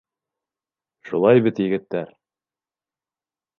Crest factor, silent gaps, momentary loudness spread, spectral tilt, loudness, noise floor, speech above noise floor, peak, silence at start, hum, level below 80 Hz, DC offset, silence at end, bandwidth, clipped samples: 22 dB; none; 14 LU; -9 dB/octave; -20 LUFS; under -90 dBFS; over 71 dB; -2 dBFS; 1.05 s; none; -68 dBFS; under 0.1%; 1.55 s; 6.4 kHz; under 0.1%